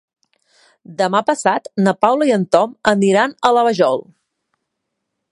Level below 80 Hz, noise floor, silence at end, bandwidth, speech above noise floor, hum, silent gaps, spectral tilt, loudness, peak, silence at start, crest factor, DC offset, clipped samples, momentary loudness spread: -62 dBFS; -76 dBFS; 1.3 s; 11.5 kHz; 61 dB; none; none; -5 dB/octave; -16 LUFS; 0 dBFS; 0.9 s; 18 dB; under 0.1%; under 0.1%; 4 LU